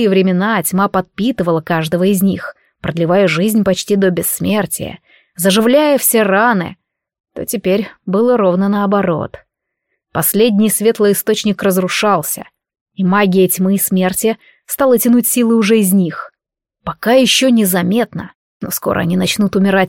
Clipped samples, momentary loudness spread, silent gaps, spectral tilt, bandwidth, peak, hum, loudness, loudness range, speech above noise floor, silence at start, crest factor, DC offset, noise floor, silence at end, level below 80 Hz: under 0.1%; 13 LU; 7.20-7.24 s, 12.81-12.86 s, 18.35-18.60 s; -4.5 dB/octave; 17 kHz; 0 dBFS; none; -13 LUFS; 2 LU; 64 dB; 0 s; 14 dB; under 0.1%; -77 dBFS; 0 s; -50 dBFS